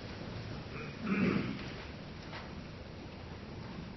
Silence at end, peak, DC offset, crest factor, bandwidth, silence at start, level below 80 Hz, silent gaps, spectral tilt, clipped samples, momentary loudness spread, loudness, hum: 0 s; -20 dBFS; under 0.1%; 20 dB; 6 kHz; 0 s; -56 dBFS; none; -5.5 dB/octave; under 0.1%; 14 LU; -40 LUFS; none